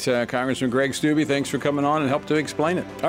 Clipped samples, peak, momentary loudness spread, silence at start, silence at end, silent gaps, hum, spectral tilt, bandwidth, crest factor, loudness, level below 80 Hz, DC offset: under 0.1%; -6 dBFS; 3 LU; 0 s; 0 s; none; none; -5 dB/octave; 16 kHz; 16 dB; -23 LUFS; -56 dBFS; under 0.1%